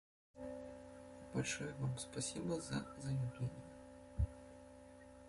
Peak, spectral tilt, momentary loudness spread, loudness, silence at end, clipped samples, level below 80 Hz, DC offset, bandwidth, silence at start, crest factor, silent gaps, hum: -26 dBFS; -5 dB/octave; 16 LU; -44 LUFS; 0 s; under 0.1%; -54 dBFS; under 0.1%; 11.5 kHz; 0.35 s; 20 dB; none; none